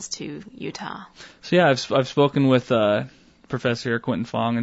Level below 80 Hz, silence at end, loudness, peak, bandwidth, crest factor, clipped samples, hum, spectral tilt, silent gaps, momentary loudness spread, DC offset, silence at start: -60 dBFS; 0 s; -22 LUFS; -6 dBFS; 8 kHz; 16 dB; under 0.1%; none; -5.5 dB/octave; none; 17 LU; under 0.1%; 0 s